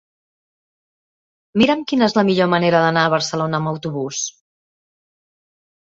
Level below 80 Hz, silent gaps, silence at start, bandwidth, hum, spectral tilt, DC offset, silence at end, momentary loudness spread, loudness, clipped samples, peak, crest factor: -58 dBFS; none; 1.55 s; 7.8 kHz; none; -4.5 dB/octave; under 0.1%; 1.65 s; 9 LU; -18 LUFS; under 0.1%; -2 dBFS; 18 dB